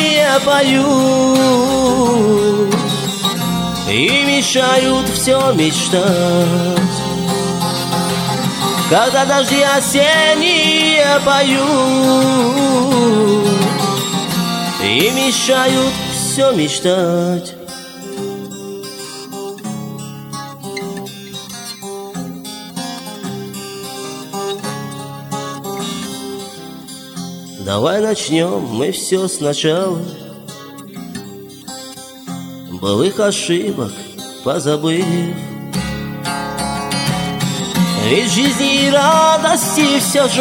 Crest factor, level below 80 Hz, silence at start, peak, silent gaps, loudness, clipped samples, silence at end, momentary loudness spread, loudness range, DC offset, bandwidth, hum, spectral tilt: 14 dB; -46 dBFS; 0 s; 0 dBFS; none; -14 LUFS; under 0.1%; 0 s; 17 LU; 15 LU; under 0.1%; 17.5 kHz; none; -4 dB/octave